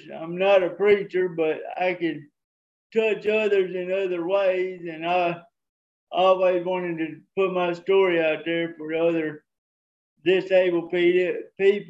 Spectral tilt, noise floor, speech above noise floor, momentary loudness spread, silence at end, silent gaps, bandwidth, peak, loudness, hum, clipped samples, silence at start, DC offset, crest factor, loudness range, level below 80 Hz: -7 dB/octave; under -90 dBFS; over 67 dB; 9 LU; 0 s; 2.44-2.90 s, 5.69-6.07 s, 9.58-10.16 s; 7.6 kHz; -6 dBFS; -23 LUFS; none; under 0.1%; 0.05 s; under 0.1%; 16 dB; 2 LU; -74 dBFS